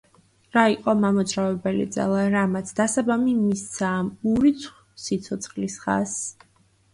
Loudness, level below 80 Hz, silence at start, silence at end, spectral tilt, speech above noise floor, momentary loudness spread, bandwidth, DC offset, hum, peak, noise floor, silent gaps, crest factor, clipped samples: -23 LUFS; -56 dBFS; 0.55 s; 0.6 s; -5 dB/octave; 34 dB; 10 LU; 11.5 kHz; under 0.1%; none; -4 dBFS; -57 dBFS; none; 20 dB; under 0.1%